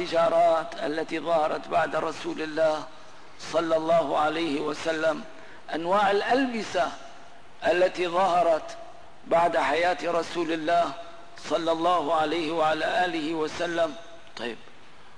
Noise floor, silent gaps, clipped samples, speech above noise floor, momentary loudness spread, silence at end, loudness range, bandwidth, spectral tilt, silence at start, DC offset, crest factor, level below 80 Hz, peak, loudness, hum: -52 dBFS; none; under 0.1%; 27 dB; 13 LU; 0.55 s; 2 LU; 10.5 kHz; -4.5 dB/octave; 0 s; 0.8%; 12 dB; -62 dBFS; -14 dBFS; -26 LUFS; none